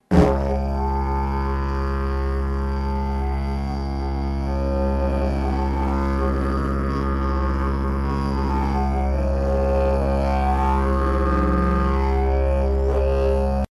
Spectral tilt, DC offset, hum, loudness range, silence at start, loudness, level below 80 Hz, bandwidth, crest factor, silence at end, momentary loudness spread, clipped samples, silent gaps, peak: -8.5 dB/octave; under 0.1%; none; 4 LU; 0.1 s; -22 LUFS; -22 dBFS; 10.5 kHz; 16 dB; 0.1 s; 5 LU; under 0.1%; none; -4 dBFS